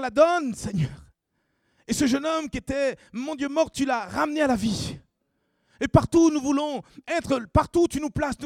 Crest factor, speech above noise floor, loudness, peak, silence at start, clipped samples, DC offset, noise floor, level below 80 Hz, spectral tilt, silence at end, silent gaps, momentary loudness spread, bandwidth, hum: 22 dB; 51 dB; -25 LUFS; -4 dBFS; 0 s; under 0.1%; under 0.1%; -74 dBFS; -46 dBFS; -5.5 dB/octave; 0 s; none; 11 LU; 15.5 kHz; none